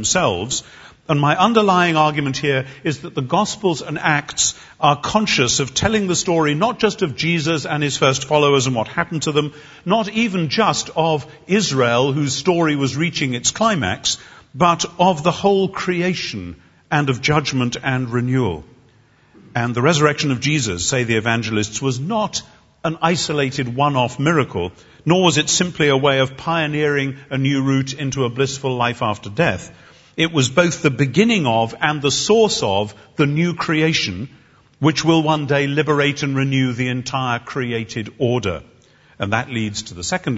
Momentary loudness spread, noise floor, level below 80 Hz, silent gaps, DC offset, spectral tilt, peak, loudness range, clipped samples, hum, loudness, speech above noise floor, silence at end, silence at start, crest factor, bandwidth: 9 LU; -53 dBFS; -50 dBFS; none; under 0.1%; -4.5 dB/octave; 0 dBFS; 3 LU; under 0.1%; none; -18 LUFS; 35 dB; 0 s; 0 s; 18 dB; 8 kHz